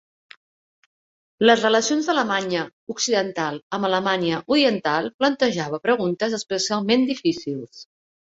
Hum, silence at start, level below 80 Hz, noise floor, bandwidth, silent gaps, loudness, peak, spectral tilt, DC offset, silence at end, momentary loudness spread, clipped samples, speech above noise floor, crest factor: none; 1.4 s; -66 dBFS; under -90 dBFS; 8 kHz; 2.73-2.87 s, 3.62-3.70 s, 5.14-5.19 s; -21 LUFS; -2 dBFS; -3.5 dB/octave; under 0.1%; 0.45 s; 9 LU; under 0.1%; over 69 dB; 22 dB